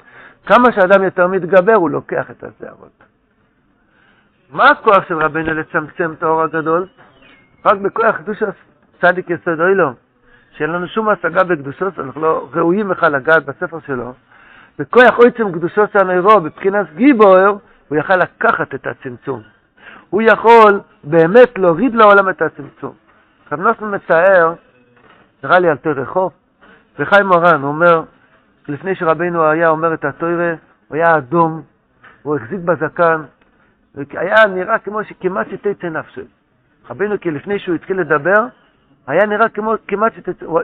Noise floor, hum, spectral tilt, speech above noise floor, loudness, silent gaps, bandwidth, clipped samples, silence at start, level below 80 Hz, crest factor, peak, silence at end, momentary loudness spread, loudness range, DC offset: -58 dBFS; none; -8 dB/octave; 44 dB; -14 LUFS; none; 6.6 kHz; 0.2%; 0.45 s; -54 dBFS; 14 dB; 0 dBFS; 0 s; 16 LU; 7 LU; under 0.1%